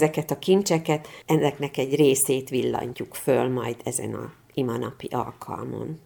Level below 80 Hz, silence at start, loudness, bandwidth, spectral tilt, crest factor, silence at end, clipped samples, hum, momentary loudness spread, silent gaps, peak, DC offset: -62 dBFS; 0 s; -25 LUFS; over 20 kHz; -5 dB/octave; 20 dB; 0.05 s; under 0.1%; none; 12 LU; none; -6 dBFS; under 0.1%